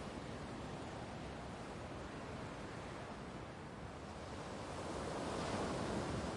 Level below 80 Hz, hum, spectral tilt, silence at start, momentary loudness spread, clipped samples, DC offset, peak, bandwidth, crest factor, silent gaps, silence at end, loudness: -58 dBFS; none; -5.5 dB/octave; 0 s; 9 LU; under 0.1%; under 0.1%; -28 dBFS; 11.5 kHz; 16 dB; none; 0 s; -46 LUFS